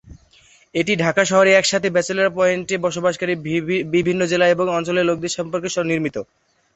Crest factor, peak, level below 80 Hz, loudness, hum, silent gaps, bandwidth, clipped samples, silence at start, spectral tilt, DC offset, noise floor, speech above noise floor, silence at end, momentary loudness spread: 18 dB; -2 dBFS; -54 dBFS; -19 LUFS; none; none; 8.2 kHz; under 0.1%; 0.05 s; -4.5 dB/octave; under 0.1%; -53 dBFS; 34 dB; 0.5 s; 9 LU